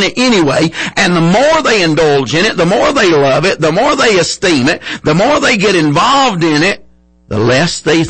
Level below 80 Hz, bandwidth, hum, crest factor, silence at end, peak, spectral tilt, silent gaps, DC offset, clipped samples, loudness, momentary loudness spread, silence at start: -40 dBFS; 8.8 kHz; none; 8 dB; 0 s; -2 dBFS; -4.5 dB/octave; none; under 0.1%; under 0.1%; -10 LUFS; 4 LU; 0 s